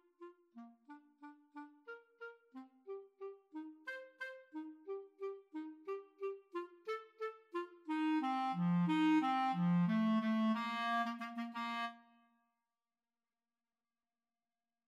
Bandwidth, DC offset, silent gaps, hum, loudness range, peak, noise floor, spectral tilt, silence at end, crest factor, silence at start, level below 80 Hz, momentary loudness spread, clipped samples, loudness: 8 kHz; under 0.1%; none; none; 17 LU; -24 dBFS; under -90 dBFS; -7.5 dB/octave; 2.9 s; 16 dB; 0.2 s; under -90 dBFS; 23 LU; under 0.1%; -39 LUFS